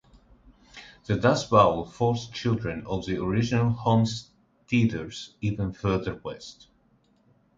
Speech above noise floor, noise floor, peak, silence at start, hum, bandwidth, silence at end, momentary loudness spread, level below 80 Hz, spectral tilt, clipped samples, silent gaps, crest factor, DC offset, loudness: 39 dB; -64 dBFS; -4 dBFS; 0.75 s; none; 7.8 kHz; 1.05 s; 17 LU; -50 dBFS; -6.5 dB/octave; under 0.1%; none; 22 dB; under 0.1%; -26 LUFS